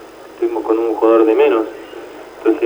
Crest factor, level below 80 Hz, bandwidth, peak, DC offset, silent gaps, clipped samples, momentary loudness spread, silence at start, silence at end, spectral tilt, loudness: 16 dB; -58 dBFS; over 20 kHz; 0 dBFS; under 0.1%; none; under 0.1%; 21 LU; 0 s; 0 s; -5.5 dB/octave; -15 LUFS